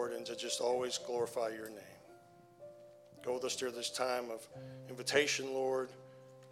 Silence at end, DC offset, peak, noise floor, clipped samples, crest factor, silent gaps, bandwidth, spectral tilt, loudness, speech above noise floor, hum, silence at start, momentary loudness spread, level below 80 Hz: 0 s; under 0.1%; -16 dBFS; -61 dBFS; under 0.1%; 24 dB; none; 16.5 kHz; -2.5 dB/octave; -37 LUFS; 23 dB; none; 0 s; 23 LU; -82 dBFS